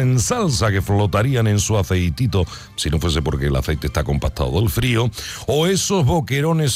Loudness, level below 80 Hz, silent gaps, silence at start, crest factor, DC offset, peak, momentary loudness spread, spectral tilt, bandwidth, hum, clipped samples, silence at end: -19 LUFS; -30 dBFS; none; 0 s; 10 dB; under 0.1%; -8 dBFS; 5 LU; -5 dB/octave; 16 kHz; none; under 0.1%; 0 s